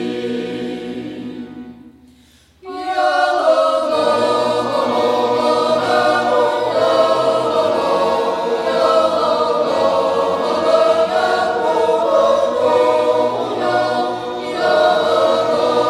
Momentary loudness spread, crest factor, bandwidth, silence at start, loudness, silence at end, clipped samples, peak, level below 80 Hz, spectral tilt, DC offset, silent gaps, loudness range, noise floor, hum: 9 LU; 14 dB; 13 kHz; 0 s; -16 LUFS; 0 s; under 0.1%; -2 dBFS; -58 dBFS; -4.5 dB/octave; under 0.1%; none; 3 LU; -50 dBFS; none